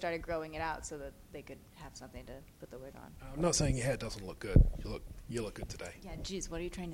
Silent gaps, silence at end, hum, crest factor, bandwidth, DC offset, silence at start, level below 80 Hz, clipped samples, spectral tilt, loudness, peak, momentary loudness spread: none; 0 s; none; 26 dB; 16 kHz; under 0.1%; 0 s; -40 dBFS; under 0.1%; -5 dB/octave; -36 LUFS; -10 dBFS; 21 LU